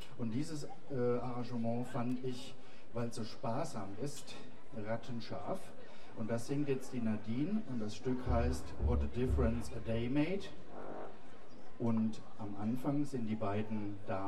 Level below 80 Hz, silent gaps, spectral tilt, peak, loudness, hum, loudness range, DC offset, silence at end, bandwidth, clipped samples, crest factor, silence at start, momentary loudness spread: -48 dBFS; none; -7 dB/octave; -20 dBFS; -39 LUFS; none; 6 LU; 1%; 0 s; 13 kHz; under 0.1%; 18 dB; 0 s; 15 LU